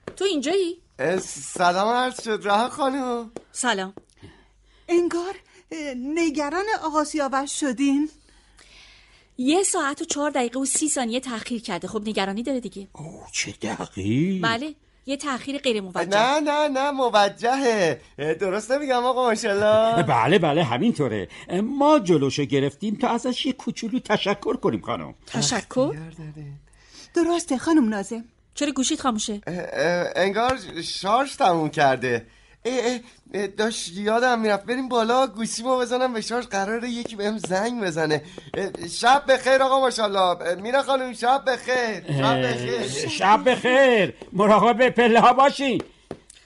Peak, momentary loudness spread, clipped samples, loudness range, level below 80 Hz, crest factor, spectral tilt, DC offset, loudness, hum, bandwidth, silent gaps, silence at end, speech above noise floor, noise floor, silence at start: -6 dBFS; 12 LU; under 0.1%; 6 LU; -58 dBFS; 16 dB; -4 dB/octave; under 0.1%; -22 LUFS; none; 11.5 kHz; none; 0.3 s; 34 dB; -56 dBFS; 0.05 s